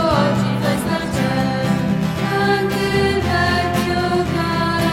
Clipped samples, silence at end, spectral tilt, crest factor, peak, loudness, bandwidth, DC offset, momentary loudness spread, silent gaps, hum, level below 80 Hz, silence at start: under 0.1%; 0 s; -6 dB/octave; 14 dB; -4 dBFS; -18 LUFS; 16.5 kHz; under 0.1%; 3 LU; none; none; -36 dBFS; 0 s